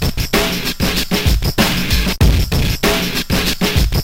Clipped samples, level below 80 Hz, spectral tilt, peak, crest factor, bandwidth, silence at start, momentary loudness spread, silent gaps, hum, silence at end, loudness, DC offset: under 0.1%; -20 dBFS; -4 dB/octave; 0 dBFS; 16 dB; 17 kHz; 0 s; 3 LU; none; none; 0 s; -16 LUFS; 2%